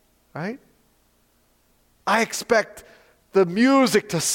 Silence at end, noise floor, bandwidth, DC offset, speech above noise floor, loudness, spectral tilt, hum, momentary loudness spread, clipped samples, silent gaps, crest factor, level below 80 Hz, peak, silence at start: 0 s; -63 dBFS; 17 kHz; under 0.1%; 42 dB; -21 LUFS; -3.5 dB/octave; none; 17 LU; under 0.1%; none; 18 dB; -62 dBFS; -6 dBFS; 0.35 s